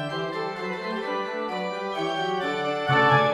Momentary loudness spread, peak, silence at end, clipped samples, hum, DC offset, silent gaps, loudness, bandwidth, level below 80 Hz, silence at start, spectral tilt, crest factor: 10 LU; -6 dBFS; 0 s; under 0.1%; none; under 0.1%; none; -26 LUFS; 13 kHz; -64 dBFS; 0 s; -5.5 dB/octave; 20 dB